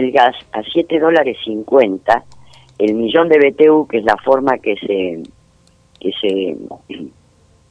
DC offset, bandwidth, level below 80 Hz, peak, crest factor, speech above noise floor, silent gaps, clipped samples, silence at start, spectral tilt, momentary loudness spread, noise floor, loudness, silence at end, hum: under 0.1%; 8.6 kHz; -54 dBFS; 0 dBFS; 16 dB; 38 dB; none; under 0.1%; 0 s; -6 dB/octave; 18 LU; -52 dBFS; -15 LUFS; 0.65 s; none